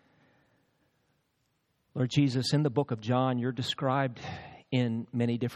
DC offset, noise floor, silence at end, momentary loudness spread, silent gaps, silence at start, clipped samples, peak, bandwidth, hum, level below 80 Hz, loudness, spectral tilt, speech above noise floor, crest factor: under 0.1%; -76 dBFS; 0 s; 11 LU; none; 1.95 s; under 0.1%; -12 dBFS; 12.5 kHz; none; -70 dBFS; -30 LUFS; -6.5 dB/octave; 47 dB; 20 dB